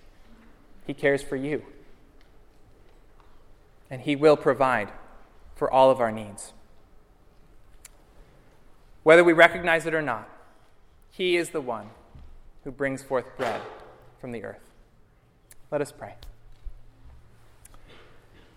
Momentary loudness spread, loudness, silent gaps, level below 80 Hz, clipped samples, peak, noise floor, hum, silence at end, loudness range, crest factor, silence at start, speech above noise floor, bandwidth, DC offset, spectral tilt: 25 LU; -23 LUFS; none; -52 dBFS; under 0.1%; 0 dBFS; -59 dBFS; none; 1.5 s; 16 LU; 28 dB; 0.85 s; 35 dB; 15.5 kHz; under 0.1%; -5 dB/octave